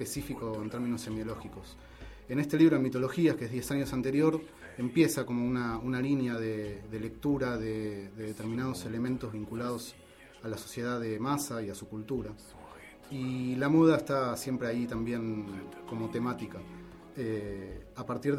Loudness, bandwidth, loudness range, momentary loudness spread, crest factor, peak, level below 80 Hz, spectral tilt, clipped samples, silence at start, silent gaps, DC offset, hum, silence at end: -32 LUFS; 15 kHz; 7 LU; 17 LU; 20 dB; -12 dBFS; -56 dBFS; -6 dB/octave; under 0.1%; 0 s; none; under 0.1%; none; 0 s